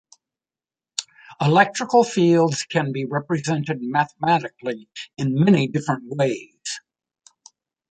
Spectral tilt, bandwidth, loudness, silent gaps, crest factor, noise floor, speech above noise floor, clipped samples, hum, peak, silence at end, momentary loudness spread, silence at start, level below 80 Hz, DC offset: -5.5 dB/octave; 9.4 kHz; -21 LUFS; none; 20 dB; under -90 dBFS; over 70 dB; under 0.1%; none; -2 dBFS; 1.15 s; 14 LU; 1 s; -64 dBFS; under 0.1%